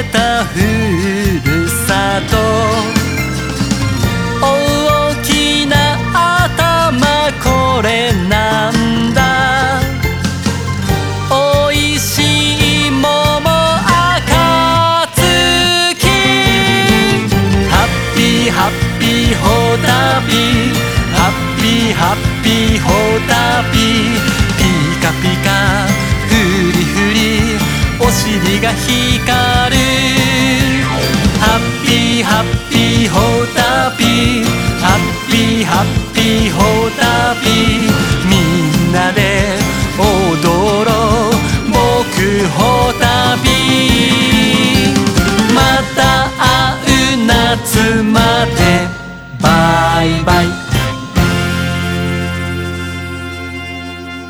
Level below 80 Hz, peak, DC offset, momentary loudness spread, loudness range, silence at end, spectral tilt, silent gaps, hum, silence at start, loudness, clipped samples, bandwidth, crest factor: -24 dBFS; 0 dBFS; under 0.1%; 5 LU; 3 LU; 0 s; -4.5 dB/octave; none; none; 0 s; -11 LUFS; under 0.1%; over 20 kHz; 12 dB